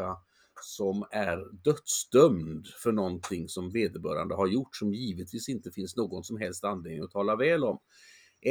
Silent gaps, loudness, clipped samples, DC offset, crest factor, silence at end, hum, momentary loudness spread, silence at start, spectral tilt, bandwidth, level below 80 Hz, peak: none; -30 LUFS; under 0.1%; under 0.1%; 24 dB; 0 s; none; 12 LU; 0 s; -5 dB/octave; over 20 kHz; -66 dBFS; -8 dBFS